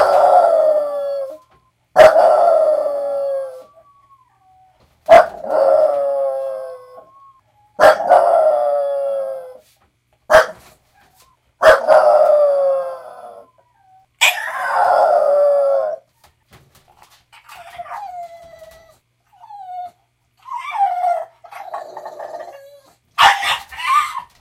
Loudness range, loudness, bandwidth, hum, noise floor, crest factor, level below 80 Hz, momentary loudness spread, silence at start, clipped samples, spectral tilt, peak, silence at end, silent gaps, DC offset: 13 LU; -14 LUFS; 16 kHz; none; -61 dBFS; 16 dB; -54 dBFS; 22 LU; 0 s; 0.1%; -1.5 dB/octave; 0 dBFS; 0.15 s; none; under 0.1%